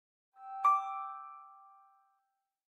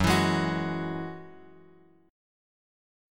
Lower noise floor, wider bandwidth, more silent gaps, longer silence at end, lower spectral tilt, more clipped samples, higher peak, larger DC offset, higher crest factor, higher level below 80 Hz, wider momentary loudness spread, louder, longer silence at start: first, -83 dBFS vs -58 dBFS; second, 12.5 kHz vs 17.5 kHz; neither; about the same, 1.1 s vs 1 s; second, 0 dB/octave vs -5.5 dB/octave; neither; second, -18 dBFS vs -10 dBFS; neither; about the same, 20 dB vs 22 dB; second, under -90 dBFS vs -50 dBFS; about the same, 23 LU vs 21 LU; second, -33 LUFS vs -29 LUFS; first, 0.4 s vs 0 s